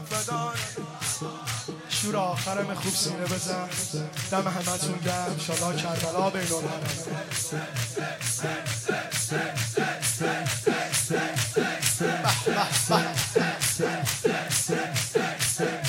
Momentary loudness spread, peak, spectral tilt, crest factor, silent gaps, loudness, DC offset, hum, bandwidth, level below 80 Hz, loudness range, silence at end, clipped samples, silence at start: 6 LU; -8 dBFS; -3 dB/octave; 20 dB; none; -27 LUFS; under 0.1%; none; 16.5 kHz; -60 dBFS; 4 LU; 0 s; under 0.1%; 0 s